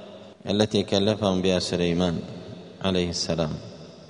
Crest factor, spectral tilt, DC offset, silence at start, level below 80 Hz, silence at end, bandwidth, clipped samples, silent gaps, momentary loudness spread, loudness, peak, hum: 20 dB; -5 dB/octave; under 0.1%; 0 s; -52 dBFS; 0 s; 10.5 kHz; under 0.1%; none; 17 LU; -25 LUFS; -6 dBFS; none